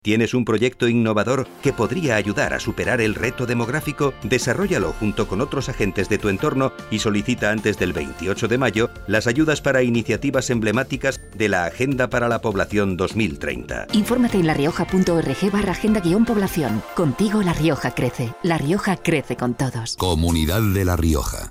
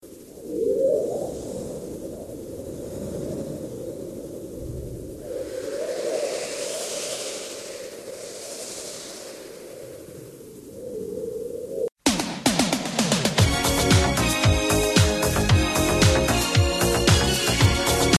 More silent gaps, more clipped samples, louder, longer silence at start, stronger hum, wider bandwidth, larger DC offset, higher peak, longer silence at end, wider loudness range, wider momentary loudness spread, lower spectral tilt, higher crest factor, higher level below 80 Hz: second, none vs 11.92-11.96 s; neither; about the same, -21 LUFS vs -23 LUFS; about the same, 0.05 s vs 0.05 s; neither; first, 16 kHz vs 14 kHz; neither; about the same, -4 dBFS vs -4 dBFS; about the same, 0 s vs 0 s; second, 2 LU vs 15 LU; second, 5 LU vs 18 LU; first, -5.5 dB/octave vs -4 dB/octave; about the same, 16 dB vs 20 dB; about the same, -38 dBFS vs -34 dBFS